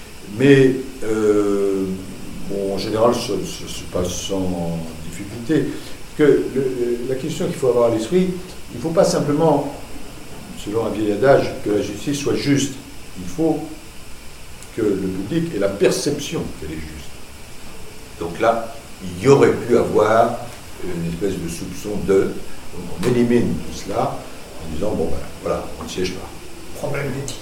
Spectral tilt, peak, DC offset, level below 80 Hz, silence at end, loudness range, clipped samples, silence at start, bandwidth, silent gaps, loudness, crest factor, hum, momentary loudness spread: -5.5 dB/octave; 0 dBFS; under 0.1%; -40 dBFS; 0 s; 6 LU; under 0.1%; 0 s; 16.5 kHz; none; -20 LUFS; 20 dB; none; 20 LU